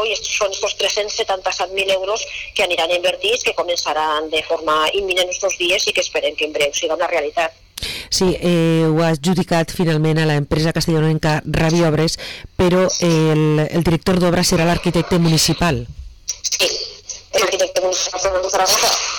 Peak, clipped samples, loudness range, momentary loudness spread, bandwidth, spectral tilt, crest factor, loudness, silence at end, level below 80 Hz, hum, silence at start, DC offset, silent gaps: -6 dBFS; under 0.1%; 2 LU; 6 LU; 19 kHz; -4 dB/octave; 10 dB; -17 LUFS; 0 s; -38 dBFS; none; 0 s; under 0.1%; none